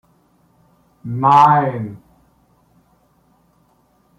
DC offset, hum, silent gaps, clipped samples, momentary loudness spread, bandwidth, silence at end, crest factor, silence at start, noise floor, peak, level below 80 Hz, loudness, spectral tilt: under 0.1%; none; none; under 0.1%; 20 LU; 8.2 kHz; 2.2 s; 18 dB; 1.05 s; -58 dBFS; -2 dBFS; -60 dBFS; -14 LUFS; -7.5 dB/octave